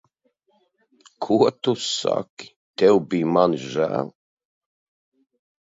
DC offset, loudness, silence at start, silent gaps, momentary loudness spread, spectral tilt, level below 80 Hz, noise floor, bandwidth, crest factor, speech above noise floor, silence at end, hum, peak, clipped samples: under 0.1%; -21 LUFS; 1.2 s; 2.30-2.37 s, 2.56-2.73 s; 17 LU; -5 dB/octave; -66 dBFS; -67 dBFS; 8 kHz; 20 dB; 47 dB; 1.65 s; none; -4 dBFS; under 0.1%